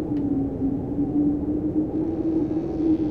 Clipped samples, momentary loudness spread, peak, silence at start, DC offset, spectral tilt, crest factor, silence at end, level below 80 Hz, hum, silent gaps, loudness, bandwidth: under 0.1%; 3 LU; -12 dBFS; 0 s; 0.2%; -11 dB/octave; 12 dB; 0 s; -42 dBFS; none; none; -25 LUFS; 3.7 kHz